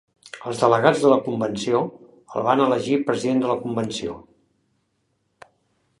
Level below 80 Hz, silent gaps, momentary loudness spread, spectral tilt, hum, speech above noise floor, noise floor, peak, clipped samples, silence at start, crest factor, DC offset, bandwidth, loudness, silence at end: -62 dBFS; none; 15 LU; -5.5 dB/octave; none; 50 dB; -71 dBFS; 0 dBFS; under 0.1%; 0.25 s; 22 dB; under 0.1%; 11.5 kHz; -21 LUFS; 1.8 s